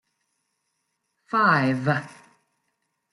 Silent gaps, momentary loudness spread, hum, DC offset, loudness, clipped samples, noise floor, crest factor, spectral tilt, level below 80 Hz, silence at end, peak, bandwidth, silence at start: none; 8 LU; none; under 0.1%; -22 LUFS; under 0.1%; -77 dBFS; 22 dB; -7 dB/octave; -72 dBFS; 1 s; -6 dBFS; 11.5 kHz; 1.3 s